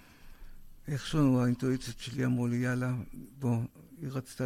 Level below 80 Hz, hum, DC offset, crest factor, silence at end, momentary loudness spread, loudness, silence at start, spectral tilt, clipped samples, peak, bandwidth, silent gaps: -52 dBFS; none; under 0.1%; 16 dB; 0 s; 14 LU; -32 LUFS; 0.25 s; -7 dB/octave; under 0.1%; -16 dBFS; 15 kHz; none